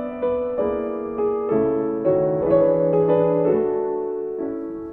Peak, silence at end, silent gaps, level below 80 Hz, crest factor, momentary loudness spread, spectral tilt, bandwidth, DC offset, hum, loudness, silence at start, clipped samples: -6 dBFS; 0 s; none; -50 dBFS; 14 dB; 9 LU; -11.5 dB/octave; 3.7 kHz; under 0.1%; none; -21 LUFS; 0 s; under 0.1%